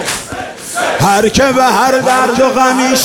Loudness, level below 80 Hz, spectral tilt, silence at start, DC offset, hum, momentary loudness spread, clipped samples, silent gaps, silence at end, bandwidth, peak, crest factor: -11 LUFS; -38 dBFS; -3.5 dB/octave; 0 s; under 0.1%; none; 10 LU; under 0.1%; none; 0 s; 18 kHz; 0 dBFS; 10 dB